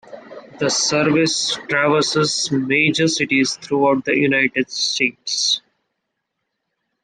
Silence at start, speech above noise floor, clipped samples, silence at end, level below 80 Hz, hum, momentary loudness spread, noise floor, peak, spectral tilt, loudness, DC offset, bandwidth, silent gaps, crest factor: 0.1 s; 58 dB; under 0.1%; 1.45 s; -60 dBFS; none; 4 LU; -76 dBFS; -4 dBFS; -3 dB/octave; -17 LUFS; under 0.1%; 11 kHz; none; 16 dB